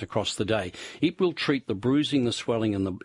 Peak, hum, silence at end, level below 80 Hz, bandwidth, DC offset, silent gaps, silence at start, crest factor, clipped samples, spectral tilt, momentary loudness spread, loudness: -10 dBFS; none; 0.05 s; -60 dBFS; 11.5 kHz; under 0.1%; none; 0 s; 16 dB; under 0.1%; -5.5 dB/octave; 5 LU; -27 LUFS